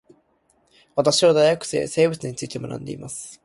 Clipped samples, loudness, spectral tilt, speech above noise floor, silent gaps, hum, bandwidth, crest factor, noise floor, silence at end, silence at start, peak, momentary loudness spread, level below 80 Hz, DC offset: under 0.1%; -21 LUFS; -4 dB/octave; 43 dB; none; none; 11.5 kHz; 18 dB; -64 dBFS; 0.1 s; 0.95 s; -4 dBFS; 16 LU; -60 dBFS; under 0.1%